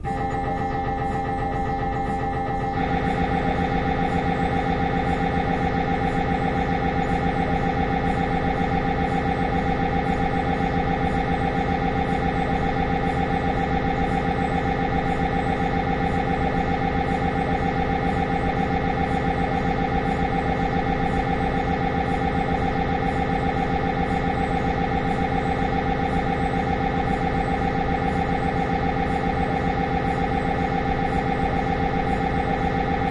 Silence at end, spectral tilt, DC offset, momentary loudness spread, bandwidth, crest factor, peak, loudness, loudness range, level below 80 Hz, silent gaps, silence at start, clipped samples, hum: 0 s; -7.5 dB/octave; under 0.1%; 1 LU; 11 kHz; 14 dB; -10 dBFS; -23 LUFS; 0 LU; -32 dBFS; none; 0 s; under 0.1%; none